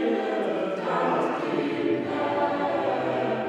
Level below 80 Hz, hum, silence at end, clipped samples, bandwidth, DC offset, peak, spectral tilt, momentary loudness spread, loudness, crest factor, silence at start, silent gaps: -72 dBFS; none; 0 s; under 0.1%; 10 kHz; under 0.1%; -12 dBFS; -6.5 dB/octave; 2 LU; -26 LUFS; 14 dB; 0 s; none